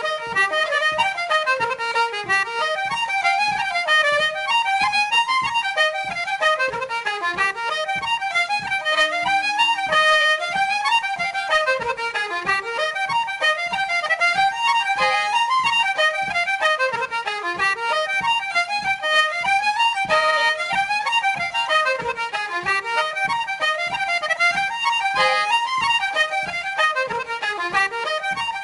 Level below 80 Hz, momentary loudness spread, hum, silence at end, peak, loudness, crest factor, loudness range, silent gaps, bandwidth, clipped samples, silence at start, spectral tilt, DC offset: -58 dBFS; 6 LU; none; 0 s; -8 dBFS; -20 LUFS; 12 dB; 2 LU; none; 11.5 kHz; under 0.1%; 0 s; -1 dB/octave; under 0.1%